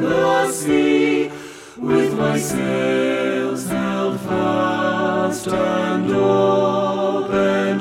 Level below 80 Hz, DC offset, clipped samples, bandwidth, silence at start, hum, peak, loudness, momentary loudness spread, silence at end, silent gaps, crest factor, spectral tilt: -52 dBFS; under 0.1%; under 0.1%; 16.5 kHz; 0 s; none; -4 dBFS; -19 LUFS; 6 LU; 0 s; none; 14 dB; -5.5 dB/octave